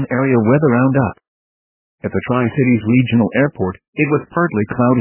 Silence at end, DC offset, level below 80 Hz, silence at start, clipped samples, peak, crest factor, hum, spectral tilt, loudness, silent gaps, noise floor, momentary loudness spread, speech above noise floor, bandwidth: 0 s; under 0.1%; -46 dBFS; 0 s; under 0.1%; 0 dBFS; 14 dB; none; -12 dB/octave; -16 LUFS; 1.28-1.98 s, 3.88-3.93 s; under -90 dBFS; 9 LU; over 75 dB; 3.2 kHz